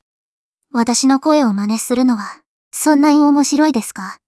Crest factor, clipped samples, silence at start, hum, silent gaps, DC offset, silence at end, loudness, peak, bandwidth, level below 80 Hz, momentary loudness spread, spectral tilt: 16 dB; under 0.1%; 0.75 s; none; 2.46-2.71 s; under 0.1%; 0.15 s; -14 LUFS; 0 dBFS; 12 kHz; -60 dBFS; 12 LU; -4 dB/octave